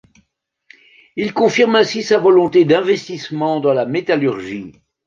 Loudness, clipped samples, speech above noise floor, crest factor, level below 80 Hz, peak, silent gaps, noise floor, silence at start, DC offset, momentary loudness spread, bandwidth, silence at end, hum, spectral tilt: -15 LUFS; under 0.1%; 53 dB; 14 dB; -60 dBFS; -2 dBFS; none; -68 dBFS; 1.15 s; under 0.1%; 14 LU; 7.4 kHz; 0.35 s; none; -5.5 dB/octave